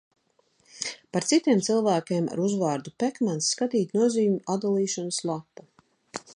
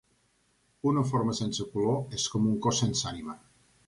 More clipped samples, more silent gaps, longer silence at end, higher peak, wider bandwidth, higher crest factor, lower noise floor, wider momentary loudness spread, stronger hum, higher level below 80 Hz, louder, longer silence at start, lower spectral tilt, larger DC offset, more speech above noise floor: neither; neither; second, 0.05 s vs 0.5 s; about the same, -10 dBFS vs -12 dBFS; about the same, 11.5 kHz vs 11.5 kHz; about the same, 16 dB vs 18 dB; about the same, -67 dBFS vs -70 dBFS; about the same, 11 LU vs 10 LU; neither; second, -74 dBFS vs -58 dBFS; first, -26 LUFS vs -29 LUFS; about the same, 0.75 s vs 0.85 s; about the same, -4.5 dB/octave vs -5 dB/octave; neither; about the same, 42 dB vs 41 dB